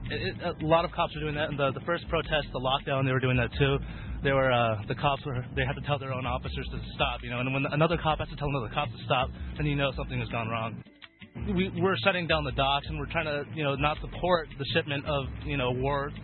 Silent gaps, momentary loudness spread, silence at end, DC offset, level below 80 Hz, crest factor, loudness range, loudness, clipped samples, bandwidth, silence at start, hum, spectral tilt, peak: none; 7 LU; 0 s; under 0.1%; -42 dBFS; 20 dB; 3 LU; -29 LUFS; under 0.1%; 4.4 kHz; 0 s; none; -10 dB/octave; -8 dBFS